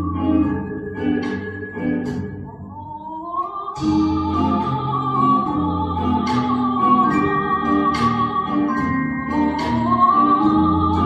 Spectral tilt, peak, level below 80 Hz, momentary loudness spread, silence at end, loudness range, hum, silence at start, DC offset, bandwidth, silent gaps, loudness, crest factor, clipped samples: -7.5 dB/octave; -4 dBFS; -44 dBFS; 12 LU; 0 s; 6 LU; none; 0 s; under 0.1%; 8.2 kHz; none; -19 LUFS; 14 dB; under 0.1%